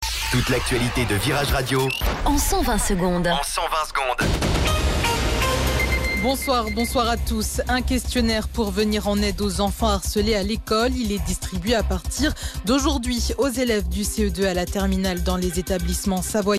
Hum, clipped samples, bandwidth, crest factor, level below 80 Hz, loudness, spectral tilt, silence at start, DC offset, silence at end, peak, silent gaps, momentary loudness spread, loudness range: none; under 0.1%; 16 kHz; 12 dB; -28 dBFS; -22 LUFS; -4.5 dB/octave; 0 s; under 0.1%; 0 s; -10 dBFS; none; 3 LU; 1 LU